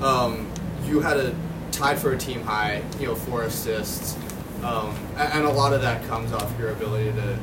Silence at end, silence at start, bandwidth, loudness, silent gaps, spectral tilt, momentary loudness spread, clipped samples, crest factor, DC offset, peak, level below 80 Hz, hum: 0 s; 0 s; 16.5 kHz; -25 LUFS; none; -5 dB/octave; 9 LU; under 0.1%; 18 dB; under 0.1%; -8 dBFS; -42 dBFS; none